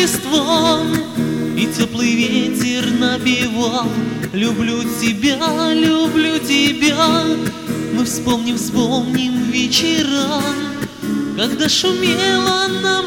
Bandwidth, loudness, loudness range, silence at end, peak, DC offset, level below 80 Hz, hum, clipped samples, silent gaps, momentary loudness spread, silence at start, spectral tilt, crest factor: 17 kHz; -16 LUFS; 2 LU; 0 s; -4 dBFS; under 0.1%; -48 dBFS; none; under 0.1%; none; 7 LU; 0 s; -3.5 dB/octave; 12 dB